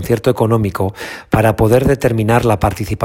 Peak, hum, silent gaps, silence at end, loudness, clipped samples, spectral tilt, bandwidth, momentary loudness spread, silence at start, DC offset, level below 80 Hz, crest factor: 0 dBFS; none; none; 0 s; -14 LUFS; under 0.1%; -7 dB/octave; 16.5 kHz; 7 LU; 0 s; under 0.1%; -32 dBFS; 14 dB